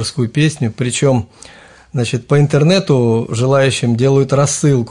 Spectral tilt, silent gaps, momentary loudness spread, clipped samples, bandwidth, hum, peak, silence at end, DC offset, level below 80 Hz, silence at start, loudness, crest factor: -5.5 dB/octave; none; 7 LU; under 0.1%; 11 kHz; none; -2 dBFS; 0 s; under 0.1%; -48 dBFS; 0 s; -14 LUFS; 12 dB